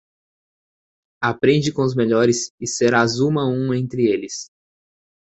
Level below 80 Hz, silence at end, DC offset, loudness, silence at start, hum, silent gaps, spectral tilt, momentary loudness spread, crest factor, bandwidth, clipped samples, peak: -56 dBFS; 0.95 s; under 0.1%; -19 LUFS; 1.2 s; none; 2.50-2.58 s; -5 dB/octave; 8 LU; 20 dB; 8.2 kHz; under 0.1%; -2 dBFS